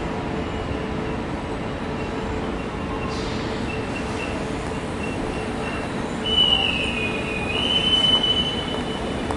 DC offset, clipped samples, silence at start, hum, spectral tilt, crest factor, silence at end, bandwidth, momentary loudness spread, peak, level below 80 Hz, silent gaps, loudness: under 0.1%; under 0.1%; 0 s; none; -4.5 dB/octave; 16 dB; 0 s; 11.5 kHz; 12 LU; -8 dBFS; -38 dBFS; none; -23 LUFS